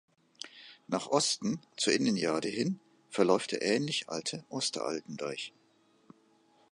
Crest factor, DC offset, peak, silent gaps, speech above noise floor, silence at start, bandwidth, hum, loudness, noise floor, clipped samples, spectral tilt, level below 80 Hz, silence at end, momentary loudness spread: 22 dB; under 0.1%; -12 dBFS; none; 36 dB; 0.45 s; 11.5 kHz; none; -32 LUFS; -67 dBFS; under 0.1%; -3.5 dB/octave; -78 dBFS; 1.2 s; 16 LU